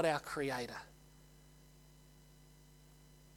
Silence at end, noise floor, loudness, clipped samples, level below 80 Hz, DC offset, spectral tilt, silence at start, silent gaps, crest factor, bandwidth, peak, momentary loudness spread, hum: 0.2 s; -62 dBFS; -40 LUFS; under 0.1%; -66 dBFS; under 0.1%; -4.5 dB/octave; 0 s; none; 24 dB; 19 kHz; -20 dBFS; 24 LU; none